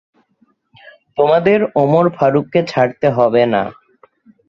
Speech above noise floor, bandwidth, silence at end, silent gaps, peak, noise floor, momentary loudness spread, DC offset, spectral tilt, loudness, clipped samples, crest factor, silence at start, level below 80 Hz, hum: 46 dB; 7.6 kHz; 0.75 s; none; 0 dBFS; -59 dBFS; 5 LU; under 0.1%; -8 dB/octave; -14 LUFS; under 0.1%; 14 dB; 1.15 s; -56 dBFS; none